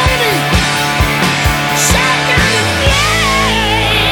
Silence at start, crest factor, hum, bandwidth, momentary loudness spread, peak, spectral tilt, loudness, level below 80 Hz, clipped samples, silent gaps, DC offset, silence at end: 0 s; 12 dB; none; over 20 kHz; 2 LU; 0 dBFS; -3 dB/octave; -11 LUFS; -22 dBFS; under 0.1%; none; under 0.1%; 0 s